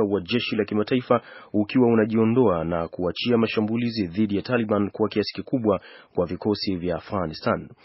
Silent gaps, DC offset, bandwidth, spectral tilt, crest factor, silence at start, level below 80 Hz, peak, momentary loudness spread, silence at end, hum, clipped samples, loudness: none; under 0.1%; 5.8 kHz; -5.5 dB/octave; 18 dB; 0 s; -54 dBFS; -6 dBFS; 8 LU; 0.15 s; none; under 0.1%; -24 LUFS